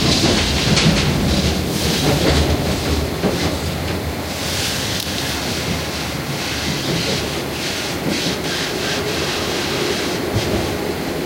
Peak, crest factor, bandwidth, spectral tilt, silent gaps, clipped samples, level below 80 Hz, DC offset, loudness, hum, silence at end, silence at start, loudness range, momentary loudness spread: -2 dBFS; 18 dB; 16 kHz; -4 dB/octave; none; under 0.1%; -30 dBFS; under 0.1%; -19 LUFS; none; 0 s; 0 s; 4 LU; 7 LU